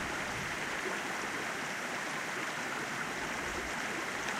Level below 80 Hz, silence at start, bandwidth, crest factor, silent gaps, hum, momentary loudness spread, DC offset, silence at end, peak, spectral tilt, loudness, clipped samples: -60 dBFS; 0 s; 16 kHz; 18 dB; none; none; 1 LU; under 0.1%; 0 s; -18 dBFS; -2.5 dB/octave; -36 LUFS; under 0.1%